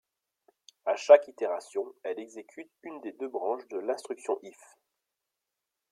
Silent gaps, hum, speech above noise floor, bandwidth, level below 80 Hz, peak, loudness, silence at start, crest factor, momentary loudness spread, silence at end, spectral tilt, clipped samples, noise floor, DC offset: none; none; 57 dB; 10.5 kHz; -88 dBFS; -6 dBFS; -29 LUFS; 0.85 s; 26 dB; 24 LU; 1.4 s; -3 dB/octave; under 0.1%; -87 dBFS; under 0.1%